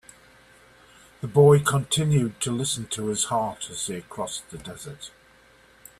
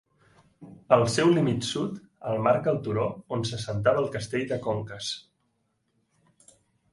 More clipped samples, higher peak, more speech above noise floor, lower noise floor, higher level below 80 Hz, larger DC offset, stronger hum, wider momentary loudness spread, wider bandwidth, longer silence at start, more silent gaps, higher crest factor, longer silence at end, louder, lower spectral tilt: neither; about the same, -6 dBFS vs -6 dBFS; second, 32 dB vs 48 dB; second, -55 dBFS vs -74 dBFS; about the same, -58 dBFS vs -58 dBFS; neither; neither; first, 21 LU vs 11 LU; first, 14 kHz vs 11.5 kHz; first, 1.2 s vs 0.6 s; neither; about the same, 20 dB vs 22 dB; second, 0.9 s vs 1.75 s; first, -23 LUFS vs -26 LUFS; about the same, -5 dB/octave vs -5.5 dB/octave